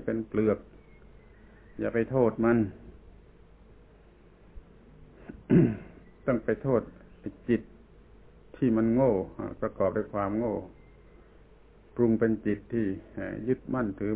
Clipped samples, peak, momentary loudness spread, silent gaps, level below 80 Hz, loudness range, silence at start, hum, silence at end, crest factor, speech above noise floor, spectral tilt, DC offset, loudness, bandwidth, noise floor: under 0.1%; -10 dBFS; 18 LU; none; -52 dBFS; 3 LU; 0 s; none; 0 s; 20 dB; 28 dB; -9 dB/octave; under 0.1%; -29 LUFS; 4 kHz; -56 dBFS